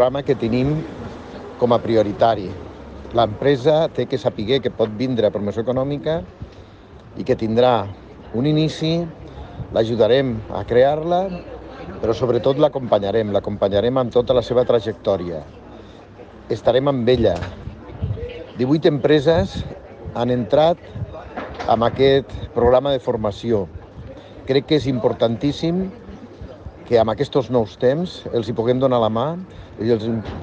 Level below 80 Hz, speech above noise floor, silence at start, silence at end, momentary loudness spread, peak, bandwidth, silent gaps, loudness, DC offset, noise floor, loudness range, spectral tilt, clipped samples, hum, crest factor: -42 dBFS; 23 dB; 0 s; 0 s; 19 LU; -4 dBFS; 8.2 kHz; none; -19 LUFS; under 0.1%; -42 dBFS; 3 LU; -7.5 dB/octave; under 0.1%; none; 16 dB